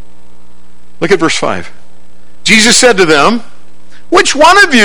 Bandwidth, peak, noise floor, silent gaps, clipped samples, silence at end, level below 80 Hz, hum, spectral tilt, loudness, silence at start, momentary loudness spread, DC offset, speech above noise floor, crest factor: over 20 kHz; 0 dBFS; -45 dBFS; none; 3%; 0 s; -40 dBFS; 60 Hz at -45 dBFS; -2.5 dB/octave; -7 LUFS; 1 s; 13 LU; 10%; 38 dB; 10 dB